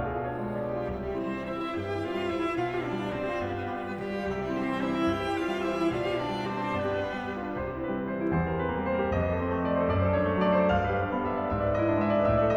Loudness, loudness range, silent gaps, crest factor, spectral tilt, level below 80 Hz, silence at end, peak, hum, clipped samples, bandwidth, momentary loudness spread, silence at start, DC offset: -29 LUFS; 5 LU; none; 16 dB; -7.5 dB/octave; -46 dBFS; 0 s; -12 dBFS; none; under 0.1%; 12 kHz; 8 LU; 0 s; under 0.1%